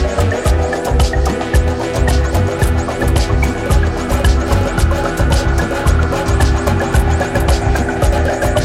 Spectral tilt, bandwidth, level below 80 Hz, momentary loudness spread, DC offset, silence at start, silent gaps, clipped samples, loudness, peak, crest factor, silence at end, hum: -6 dB/octave; 15.5 kHz; -16 dBFS; 2 LU; under 0.1%; 0 s; none; under 0.1%; -15 LUFS; -2 dBFS; 12 dB; 0 s; none